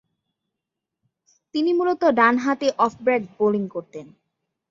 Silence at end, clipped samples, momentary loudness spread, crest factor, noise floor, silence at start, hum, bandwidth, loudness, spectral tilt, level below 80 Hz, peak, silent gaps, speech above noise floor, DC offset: 0.65 s; under 0.1%; 15 LU; 20 dB; -84 dBFS; 1.55 s; none; 7.6 kHz; -21 LUFS; -5.5 dB/octave; -68 dBFS; -4 dBFS; none; 63 dB; under 0.1%